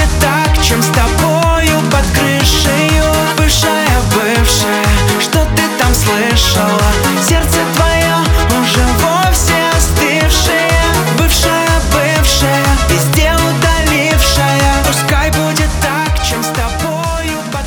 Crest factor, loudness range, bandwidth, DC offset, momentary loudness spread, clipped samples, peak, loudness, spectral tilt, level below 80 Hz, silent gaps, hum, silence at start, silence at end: 10 dB; 1 LU; over 20 kHz; under 0.1%; 3 LU; under 0.1%; 0 dBFS; -11 LUFS; -4 dB/octave; -18 dBFS; none; none; 0 s; 0 s